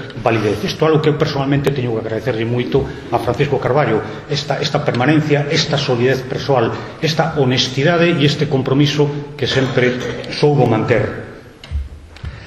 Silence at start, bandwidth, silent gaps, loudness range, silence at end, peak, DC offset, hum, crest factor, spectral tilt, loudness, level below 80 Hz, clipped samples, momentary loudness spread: 0 s; 13.5 kHz; none; 2 LU; 0 s; 0 dBFS; under 0.1%; none; 16 dB; -6 dB/octave; -16 LUFS; -38 dBFS; under 0.1%; 9 LU